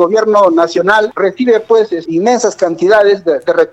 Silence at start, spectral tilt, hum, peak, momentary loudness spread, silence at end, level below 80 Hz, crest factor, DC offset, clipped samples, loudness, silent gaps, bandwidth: 0 s; -4.5 dB/octave; none; 0 dBFS; 5 LU; 0.05 s; -56 dBFS; 10 dB; under 0.1%; 0.1%; -11 LUFS; none; 8.6 kHz